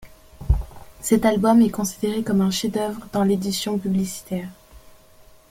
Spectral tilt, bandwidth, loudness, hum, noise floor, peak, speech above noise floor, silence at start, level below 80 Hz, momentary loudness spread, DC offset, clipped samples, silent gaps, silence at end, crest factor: -5.5 dB/octave; 16.5 kHz; -22 LUFS; none; -50 dBFS; -6 dBFS; 29 dB; 0 s; -34 dBFS; 14 LU; under 0.1%; under 0.1%; none; 0.75 s; 16 dB